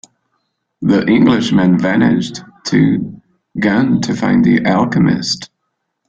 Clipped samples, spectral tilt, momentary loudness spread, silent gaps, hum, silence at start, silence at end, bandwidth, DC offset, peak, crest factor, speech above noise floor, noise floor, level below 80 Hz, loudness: under 0.1%; -6 dB/octave; 10 LU; none; none; 0.8 s; 0.65 s; 8.6 kHz; under 0.1%; 0 dBFS; 14 dB; 59 dB; -71 dBFS; -48 dBFS; -13 LUFS